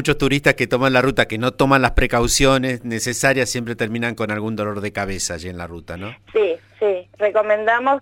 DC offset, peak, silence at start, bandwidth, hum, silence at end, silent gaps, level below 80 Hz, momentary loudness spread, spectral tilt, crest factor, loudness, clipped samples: under 0.1%; 0 dBFS; 0 s; 17 kHz; none; 0 s; none; -32 dBFS; 9 LU; -4 dB/octave; 18 dB; -19 LUFS; under 0.1%